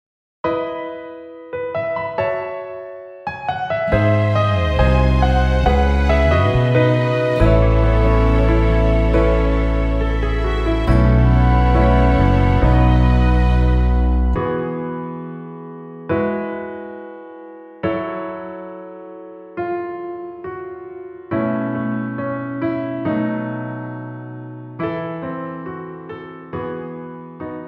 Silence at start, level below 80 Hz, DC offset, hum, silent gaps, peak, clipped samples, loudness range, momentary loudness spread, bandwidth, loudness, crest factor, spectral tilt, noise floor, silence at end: 0.45 s; -22 dBFS; under 0.1%; none; none; -2 dBFS; under 0.1%; 13 LU; 18 LU; 6.2 kHz; -18 LUFS; 16 dB; -8.5 dB/octave; -37 dBFS; 0 s